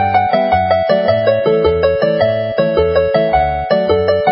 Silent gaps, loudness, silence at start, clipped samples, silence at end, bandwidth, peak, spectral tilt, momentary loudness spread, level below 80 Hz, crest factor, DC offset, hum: none; -13 LUFS; 0 s; under 0.1%; 0 s; 5.6 kHz; 0 dBFS; -11 dB/octave; 2 LU; -32 dBFS; 12 dB; under 0.1%; none